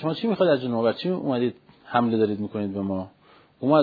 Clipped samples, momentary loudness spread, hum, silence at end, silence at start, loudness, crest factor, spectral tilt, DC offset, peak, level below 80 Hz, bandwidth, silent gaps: under 0.1%; 8 LU; none; 0 s; 0 s; -25 LUFS; 18 dB; -9.5 dB/octave; under 0.1%; -6 dBFS; -68 dBFS; 5 kHz; none